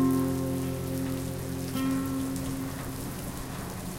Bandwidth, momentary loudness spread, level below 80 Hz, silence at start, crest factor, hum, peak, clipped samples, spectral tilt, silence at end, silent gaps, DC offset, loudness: 17 kHz; 8 LU; -48 dBFS; 0 s; 14 dB; none; -16 dBFS; under 0.1%; -6 dB/octave; 0 s; none; under 0.1%; -32 LUFS